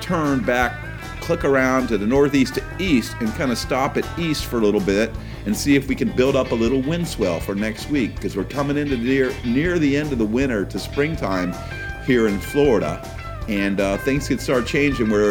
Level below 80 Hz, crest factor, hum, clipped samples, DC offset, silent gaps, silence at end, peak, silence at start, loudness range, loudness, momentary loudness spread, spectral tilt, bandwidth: -36 dBFS; 16 dB; none; under 0.1%; under 0.1%; none; 0 s; -4 dBFS; 0 s; 2 LU; -21 LUFS; 8 LU; -5.5 dB/octave; 19 kHz